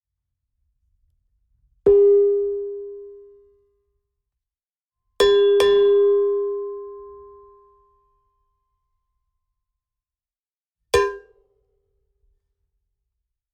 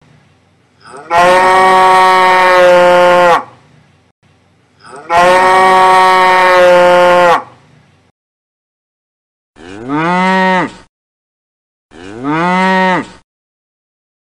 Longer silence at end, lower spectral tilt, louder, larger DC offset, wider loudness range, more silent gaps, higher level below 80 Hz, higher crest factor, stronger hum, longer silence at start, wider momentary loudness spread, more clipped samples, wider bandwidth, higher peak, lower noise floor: first, 2.35 s vs 1.25 s; about the same, -4 dB/octave vs -4.5 dB/octave; second, -18 LUFS vs -8 LUFS; neither; about the same, 10 LU vs 9 LU; second, 10.40-10.44 s, 10.57-10.61 s vs 4.11-4.22 s, 8.11-9.54 s, 10.89-11.89 s; about the same, -52 dBFS vs -48 dBFS; first, 20 dB vs 10 dB; neither; first, 1.85 s vs 0.95 s; first, 22 LU vs 9 LU; neither; second, 12.5 kHz vs 14.5 kHz; second, -4 dBFS vs 0 dBFS; first, under -90 dBFS vs -50 dBFS